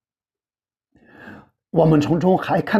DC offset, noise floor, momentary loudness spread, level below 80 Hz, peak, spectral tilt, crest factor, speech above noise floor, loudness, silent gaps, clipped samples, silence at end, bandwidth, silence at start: under 0.1%; under -90 dBFS; 4 LU; -50 dBFS; -4 dBFS; -8 dB/octave; 18 dB; over 74 dB; -18 LUFS; none; under 0.1%; 0 s; 12.5 kHz; 1.2 s